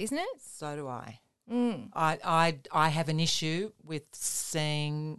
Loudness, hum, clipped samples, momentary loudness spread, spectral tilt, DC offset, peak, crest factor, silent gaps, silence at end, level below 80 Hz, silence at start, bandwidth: -31 LUFS; none; under 0.1%; 13 LU; -4 dB/octave; under 0.1%; -10 dBFS; 20 dB; none; 0 s; -66 dBFS; 0 s; 12.5 kHz